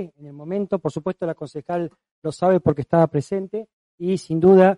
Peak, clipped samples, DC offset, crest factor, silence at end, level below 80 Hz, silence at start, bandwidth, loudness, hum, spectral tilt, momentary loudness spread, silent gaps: -2 dBFS; under 0.1%; under 0.1%; 18 dB; 0 s; -56 dBFS; 0 s; 11 kHz; -22 LUFS; none; -8 dB/octave; 14 LU; 2.11-2.22 s, 3.73-3.98 s